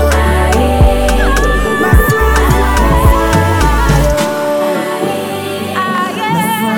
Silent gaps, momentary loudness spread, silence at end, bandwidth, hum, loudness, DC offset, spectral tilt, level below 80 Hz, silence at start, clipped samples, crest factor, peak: none; 6 LU; 0 s; 18.5 kHz; none; -12 LUFS; 2%; -5.5 dB/octave; -14 dBFS; 0 s; under 0.1%; 10 dB; 0 dBFS